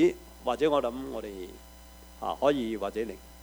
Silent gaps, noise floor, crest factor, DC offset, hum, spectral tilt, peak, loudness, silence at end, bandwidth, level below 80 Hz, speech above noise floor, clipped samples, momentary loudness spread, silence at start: none; -50 dBFS; 18 dB; under 0.1%; none; -5.5 dB/octave; -12 dBFS; -31 LUFS; 0 s; over 20 kHz; -52 dBFS; 20 dB; under 0.1%; 23 LU; 0 s